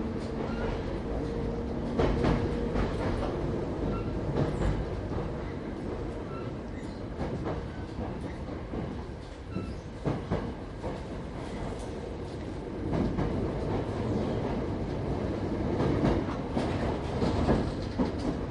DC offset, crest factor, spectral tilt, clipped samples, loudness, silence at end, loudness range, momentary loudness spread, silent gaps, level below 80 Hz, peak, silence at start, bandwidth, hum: under 0.1%; 18 dB; -8 dB/octave; under 0.1%; -33 LUFS; 0 s; 7 LU; 10 LU; none; -38 dBFS; -14 dBFS; 0 s; 11.5 kHz; none